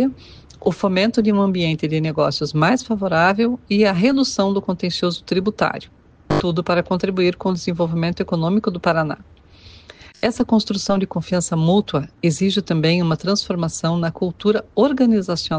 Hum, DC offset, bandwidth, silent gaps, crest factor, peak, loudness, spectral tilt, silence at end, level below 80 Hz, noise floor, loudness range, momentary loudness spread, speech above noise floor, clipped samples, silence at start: none; under 0.1%; 9.6 kHz; none; 14 dB; -4 dBFS; -19 LUFS; -6 dB/octave; 0 s; -48 dBFS; -45 dBFS; 3 LU; 6 LU; 26 dB; under 0.1%; 0 s